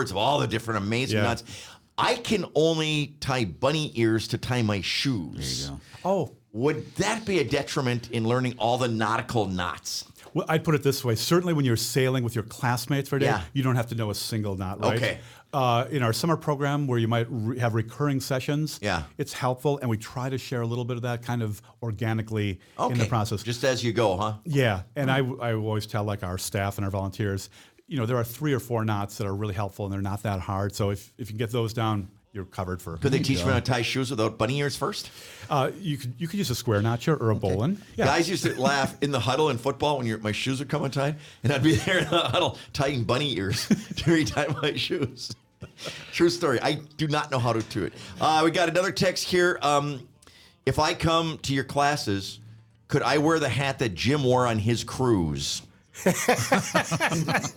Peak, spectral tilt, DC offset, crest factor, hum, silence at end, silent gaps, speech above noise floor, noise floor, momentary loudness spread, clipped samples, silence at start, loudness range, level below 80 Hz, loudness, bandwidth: -8 dBFS; -5 dB/octave; under 0.1%; 18 dB; none; 0 s; none; 29 dB; -55 dBFS; 9 LU; under 0.1%; 0 s; 4 LU; -54 dBFS; -26 LUFS; 19.5 kHz